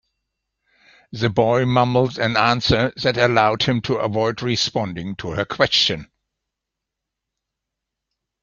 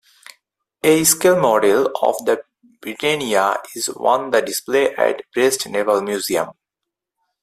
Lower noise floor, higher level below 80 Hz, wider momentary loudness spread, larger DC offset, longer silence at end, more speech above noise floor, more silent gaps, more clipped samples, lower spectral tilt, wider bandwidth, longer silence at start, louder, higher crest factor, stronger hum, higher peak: about the same, -83 dBFS vs -83 dBFS; first, -48 dBFS vs -62 dBFS; about the same, 9 LU vs 9 LU; neither; first, 2.4 s vs 0.9 s; about the same, 64 dB vs 65 dB; neither; neither; first, -5 dB/octave vs -3 dB/octave; second, 7.4 kHz vs 16 kHz; first, 1.1 s vs 0.85 s; about the same, -19 LUFS vs -18 LUFS; about the same, 20 dB vs 18 dB; neither; about the same, -2 dBFS vs 0 dBFS